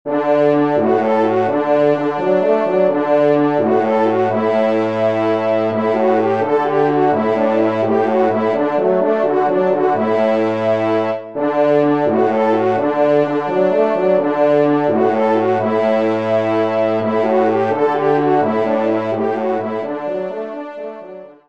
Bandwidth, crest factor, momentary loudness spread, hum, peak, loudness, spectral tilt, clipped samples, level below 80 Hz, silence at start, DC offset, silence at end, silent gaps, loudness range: 7.4 kHz; 12 dB; 5 LU; none; -2 dBFS; -16 LUFS; -8 dB/octave; under 0.1%; -64 dBFS; 0.05 s; 0.4%; 0.15 s; none; 1 LU